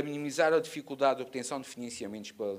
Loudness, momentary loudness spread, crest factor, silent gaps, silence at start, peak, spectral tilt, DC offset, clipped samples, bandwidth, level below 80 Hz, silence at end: -32 LUFS; 13 LU; 20 dB; none; 0 s; -12 dBFS; -4 dB/octave; under 0.1%; under 0.1%; 15.5 kHz; -76 dBFS; 0 s